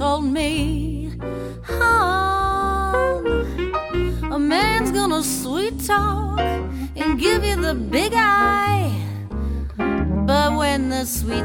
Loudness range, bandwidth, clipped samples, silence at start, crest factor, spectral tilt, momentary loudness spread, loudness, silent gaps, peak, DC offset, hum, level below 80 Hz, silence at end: 1 LU; 17.5 kHz; under 0.1%; 0 s; 16 dB; -5 dB/octave; 10 LU; -20 LUFS; none; -4 dBFS; under 0.1%; none; -30 dBFS; 0 s